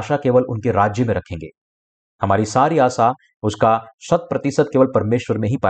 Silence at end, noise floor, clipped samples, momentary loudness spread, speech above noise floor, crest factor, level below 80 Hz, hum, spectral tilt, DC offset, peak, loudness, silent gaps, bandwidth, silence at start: 0 s; under -90 dBFS; under 0.1%; 9 LU; over 72 dB; 16 dB; -50 dBFS; none; -6.5 dB/octave; under 0.1%; -4 dBFS; -18 LUFS; 1.57-2.19 s, 3.36-3.40 s, 3.94-3.98 s; 9 kHz; 0 s